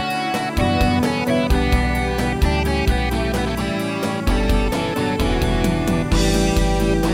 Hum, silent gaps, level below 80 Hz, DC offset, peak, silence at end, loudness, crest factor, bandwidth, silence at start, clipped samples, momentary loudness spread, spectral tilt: none; none; -24 dBFS; under 0.1%; -4 dBFS; 0 s; -20 LUFS; 14 dB; 16.5 kHz; 0 s; under 0.1%; 4 LU; -5.5 dB/octave